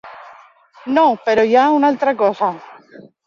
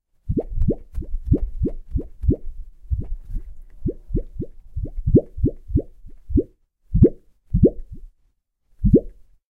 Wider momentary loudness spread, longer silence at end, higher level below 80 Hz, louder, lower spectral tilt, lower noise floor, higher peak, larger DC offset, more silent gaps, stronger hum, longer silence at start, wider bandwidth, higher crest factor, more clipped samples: second, 9 LU vs 17 LU; first, 0.55 s vs 0.4 s; second, -62 dBFS vs -28 dBFS; first, -15 LUFS vs -23 LUFS; second, -5.5 dB/octave vs -14 dB/octave; second, -46 dBFS vs -65 dBFS; about the same, -2 dBFS vs -2 dBFS; neither; neither; neither; second, 0.05 s vs 0.25 s; first, 7.2 kHz vs 1.7 kHz; second, 14 dB vs 20 dB; neither